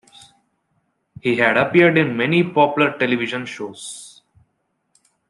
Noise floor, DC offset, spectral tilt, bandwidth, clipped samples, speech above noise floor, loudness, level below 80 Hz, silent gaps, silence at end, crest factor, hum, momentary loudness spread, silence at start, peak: -71 dBFS; under 0.1%; -5.5 dB/octave; 11.5 kHz; under 0.1%; 53 dB; -17 LUFS; -64 dBFS; none; 1.2 s; 18 dB; none; 17 LU; 1.25 s; -2 dBFS